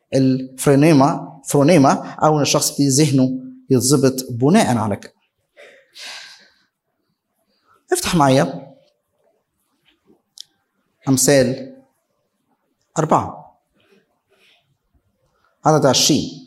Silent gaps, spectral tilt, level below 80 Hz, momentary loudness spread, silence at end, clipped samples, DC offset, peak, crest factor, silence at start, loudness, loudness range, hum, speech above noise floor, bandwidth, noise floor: none; -5 dB/octave; -54 dBFS; 17 LU; 0.05 s; under 0.1%; under 0.1%; 0 dBFS; 18 dB; 0.1 s; -16 LUFS; 11 LU; none; 56 dB; 16.5 kHz; -72 dBFS